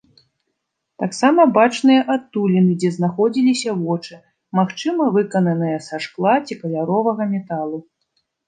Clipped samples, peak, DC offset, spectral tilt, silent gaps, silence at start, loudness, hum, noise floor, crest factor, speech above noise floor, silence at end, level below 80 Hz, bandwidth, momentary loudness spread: under 0.1%; -2 dBFS; under 0.1%; -6.5 dB/octave; none; 1 s; -18 LUFS; none; -76 dBFS; 18 dB; 58 dB; 0.65 s; -70 dBFS; 9.6 kHz; 12 LU